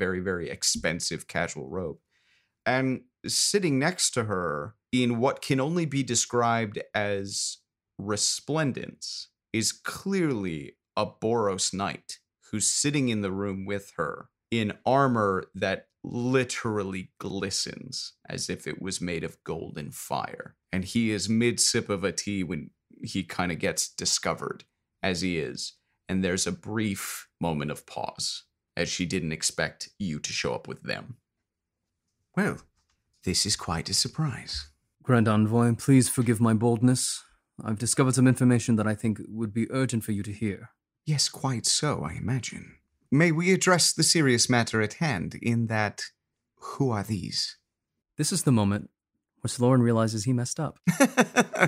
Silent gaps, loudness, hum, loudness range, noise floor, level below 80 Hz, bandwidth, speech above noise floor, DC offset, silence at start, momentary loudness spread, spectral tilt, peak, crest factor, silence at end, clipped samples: none; -27 LUFS; none; 7 LU; -84 dBFS; -58 dBFS; 16 kHz; 58 dB; under 0.1%; 0 s; 14 LU; -4 dB/octave; -6 dBFS; 22 dB; 0 s; under 0.1%